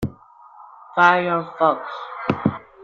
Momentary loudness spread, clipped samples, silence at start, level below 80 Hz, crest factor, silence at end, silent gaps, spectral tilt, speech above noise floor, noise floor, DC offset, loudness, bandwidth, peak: 13 LU; under 0.1%; 0 s; -54 dBFS; 20 dB; 0 s; none; -7 dB/octave; 28 dB; -47 dBFS; under 0.1%; -20 LUFS; 15 kHz; -2 dBFS